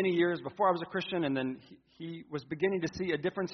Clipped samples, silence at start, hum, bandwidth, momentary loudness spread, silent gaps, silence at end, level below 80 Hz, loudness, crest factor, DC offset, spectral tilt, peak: under 0.1%; 0 s; none; 6.4 kHz; 14 LU; none; 0 s; -68 dBFS; -32 LUFS; 18 dB; under 0.1%; -4.5 dB/octave; -14 dBFS